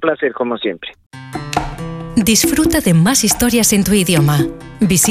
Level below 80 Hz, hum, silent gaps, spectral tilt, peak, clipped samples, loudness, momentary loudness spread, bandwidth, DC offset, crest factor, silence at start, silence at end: -36 dBFS; none; 1.06-1.10 s; -4 dB/octave; -2 dBFS; under 0.1%; -14 LUFS; 14 LU; 16 kHz; under 0.1%; 14 dB; 0 s; 0 s